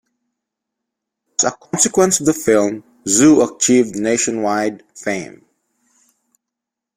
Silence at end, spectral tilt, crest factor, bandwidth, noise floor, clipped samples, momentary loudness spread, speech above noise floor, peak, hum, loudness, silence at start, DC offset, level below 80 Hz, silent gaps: 1.7 s; -3.5 dB/octave; 18 dB; 16.5 kHz; -83 dBFS; under 0.1%; 12 LU; 67 dB; 0 dBFS; none; -16 LUFS; 1.4 s; under 0.1%; -56 dBFS; none